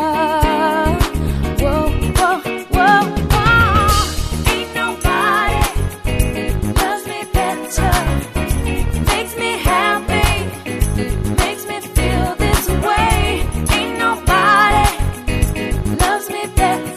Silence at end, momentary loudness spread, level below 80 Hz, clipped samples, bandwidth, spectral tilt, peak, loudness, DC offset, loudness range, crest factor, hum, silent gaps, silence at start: 0 s; 8 LU; -22 dBFS; under 0.1%; 14 kHz; -4.5 dB/octave; 0 dBFS; -16 LUFS; under 0.1%; 3 LU; 16 dB; none; none; 0 s